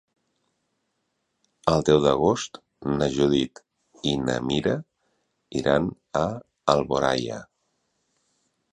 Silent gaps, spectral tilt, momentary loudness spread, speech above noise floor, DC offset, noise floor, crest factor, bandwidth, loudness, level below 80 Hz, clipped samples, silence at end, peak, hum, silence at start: none; -5.5 dB/octave; 13 LU; 53 dB; under 0.1%; -76 dBFS; 24 dB; 11 kHz; -24 LUFS; -50 dBFS; under 0.1%; 1.3 s; -2 dBFS; none; 1.65 s